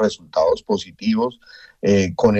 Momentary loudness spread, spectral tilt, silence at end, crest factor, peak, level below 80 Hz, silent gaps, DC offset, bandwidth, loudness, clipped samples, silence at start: 7 LU; -6 dB/octave; 0 s; 16 dB; -4 dBFS; -50 dBFS; none; under 0.1%; 8.4 kHz; -20 LUFS; under 0.1%; 0 s